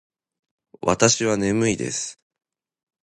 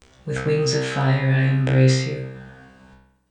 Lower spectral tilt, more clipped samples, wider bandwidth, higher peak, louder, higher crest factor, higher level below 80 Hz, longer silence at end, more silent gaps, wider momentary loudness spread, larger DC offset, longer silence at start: second, -3.5 dB/octave vs -6 dB/octave; neither; first, 11.5 kHz vs 9.4 kHz; first, -2 dBFS vs -6 dBFS; about the same, -21 LUFS vs -20 LUFS; first, 22 dB vs 16 dB; about the same, -54 dBFS vs -50 dBFS; first, 0.95 s vs 0.8 s; neither; second, 10 LU vs 14 LU; neither; first, 0.85 s vs 0.25 s